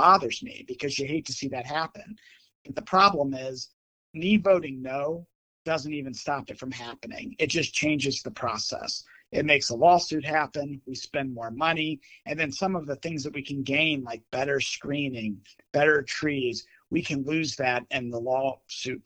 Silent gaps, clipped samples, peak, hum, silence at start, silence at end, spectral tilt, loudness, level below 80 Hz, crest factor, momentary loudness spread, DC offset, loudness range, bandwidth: 2.55-2.65 s, 3.73-4.14 s, 5.35-5.65 s; under 0.1%; -4 dBFS; none; 0 s; 0.05 s; -4 dB/octave; -27 LUFS; -62 dBFS; 24 dB; 15 LU; under 0.1%; 4 LU; 9.4 kHz